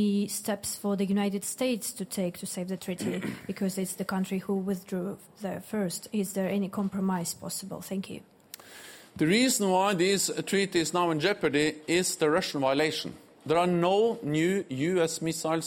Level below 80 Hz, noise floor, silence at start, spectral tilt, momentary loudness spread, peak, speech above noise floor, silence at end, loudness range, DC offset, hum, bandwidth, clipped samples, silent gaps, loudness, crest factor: -68 dBFS; -49 dBFS; 0 s; -4.5 dB/octave; 12 LU; -12 dBFS; 20 dB; 0 s; 7 LU; under 0.1%; none; 17 kHz; under 0.1%; none; -29 LUFS; 16 dB